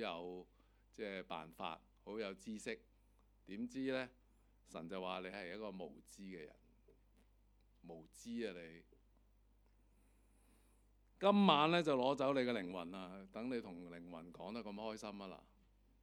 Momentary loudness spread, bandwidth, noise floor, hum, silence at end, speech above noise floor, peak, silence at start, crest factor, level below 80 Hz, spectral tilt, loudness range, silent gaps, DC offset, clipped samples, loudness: 20 LU; 13 kHz; -72 dBFS; none; 0.65 s; 30 dB; -16 dBFS; 0 s; 28 dB; -72 dBFS; -5.5 dB/octave; 17 LU; none; under 0.1%; under 0.1%; -41 LUFS